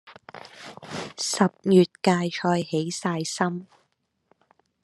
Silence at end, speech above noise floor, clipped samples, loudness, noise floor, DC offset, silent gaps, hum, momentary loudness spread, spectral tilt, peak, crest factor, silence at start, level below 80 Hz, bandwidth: 1.2 s; 49 dB; under 0.1%; -24 LUFS; -73 dBFS; under 0.1%; none; none; 22 LU; -5 dB/octave; -4 dBFS; 22 dB; 0.05 s; -70 dBFS; 12.5 kHz